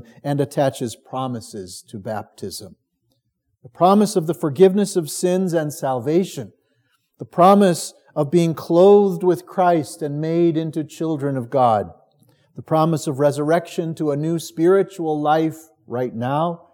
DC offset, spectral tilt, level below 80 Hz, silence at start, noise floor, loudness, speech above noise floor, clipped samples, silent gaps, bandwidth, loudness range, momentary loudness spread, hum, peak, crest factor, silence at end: under 0.1%; -6.5 dB/octave; -72 dBFS; 0.25 s; -71 dBFS; -19 LUFS; 52 dB; under 0.1%; none; 18 kHz; 6 LU; 15 LU; none; -2 dBFS; 18 dB; 0.2 s